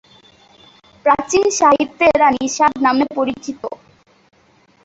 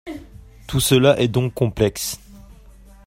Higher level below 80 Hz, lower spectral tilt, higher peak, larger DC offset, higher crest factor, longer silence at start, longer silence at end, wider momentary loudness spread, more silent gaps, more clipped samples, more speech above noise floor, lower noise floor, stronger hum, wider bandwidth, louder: second, -52 dBFS vs -42 dBFS; second, -3 dB/octave vs -5 dB/octave; about the same, 0 dBFS vs -2 dBFS; neither; about the same, 18 dB vs 20 dB; first, 1.05 s vs 0.05 s; first, 1.1 s vs 0.55 s; second, 15 LU vs 20 LU; neither; neither; first, 39 dB vs 27 dB; first, -54 dBFS vs -45 dBFS; neither; second, 8.2 kHz vs 16 kHz; first, -15 LUFS vs -19 LUFS